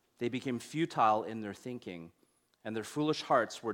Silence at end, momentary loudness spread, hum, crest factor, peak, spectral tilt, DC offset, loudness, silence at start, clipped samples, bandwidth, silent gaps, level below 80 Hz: 0 s; 15 LU; none; 20 dB; -14 dBFS; -5 dB/octave; under 0.1%; -34 LUFS; 0.2 s; under 0.1%; 17 kHz; none; -76 dBFS